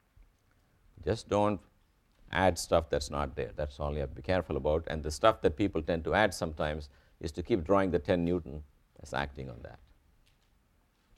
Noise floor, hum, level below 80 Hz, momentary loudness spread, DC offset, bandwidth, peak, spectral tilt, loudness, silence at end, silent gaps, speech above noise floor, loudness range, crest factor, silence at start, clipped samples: -70 dBFS; none; -46 dBFS; 14 LU; under 0.1%; 15 kHz; -10 dBFS; -5.5 dB/octave; -32 LUFS; 1.4 s; none; 39 dB; 3 LU; 22 dB; 1 s; under 0.1%